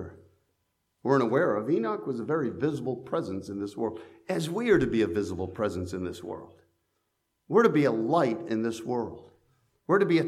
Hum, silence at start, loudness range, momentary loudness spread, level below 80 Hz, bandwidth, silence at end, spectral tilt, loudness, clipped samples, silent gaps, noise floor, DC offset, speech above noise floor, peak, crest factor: none; 0 s; 2 LU; 12 LU; -58 dBFS; 13.5 kHz; 0 s; -7 dB/octave; -28 LUFS; under 0.1%; none; -78 dBFS; under 0.1%; 51 dB; -8 dBFS; 20 dB